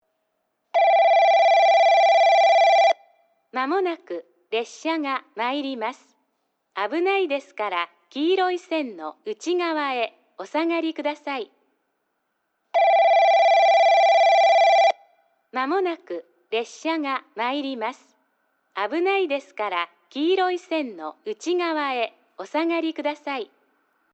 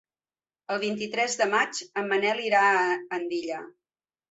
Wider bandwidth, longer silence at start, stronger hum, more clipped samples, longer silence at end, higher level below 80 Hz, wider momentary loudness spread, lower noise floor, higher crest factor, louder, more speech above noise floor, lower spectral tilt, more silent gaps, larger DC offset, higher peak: about the same, 8.2 kHz vs 8.4 kHz; about the same, 0.75 s vs 0.7 s; neither; neither; about the same, 0.7 s vs 0.6 s; second, -90 dBFS vs -78 dBFS; first, 16 LU vs 10 LU; second, -74 dBFS vs under -90 dBFS; second, 12 dB vs 18 dB; first, -21 LUFS vs -26 LUFS; second, 49 dB vs over 64 dB; about the same, -2 dB/octave vs -2.5 dB/octave; neither; neither; about the same, -10 dBFS vs -10 dBFS